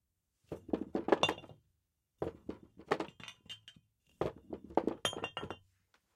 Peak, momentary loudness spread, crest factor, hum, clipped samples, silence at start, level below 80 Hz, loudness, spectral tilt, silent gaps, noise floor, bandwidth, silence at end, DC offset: -10 dBFS; 18 LU; 32 dB; none; under 0.1%; 0.5 s; -66 dBFS; -38 LUFS; -4 dB/octave; none; -82 dBFS; 16 kHz; 0.6 s; under 0.1%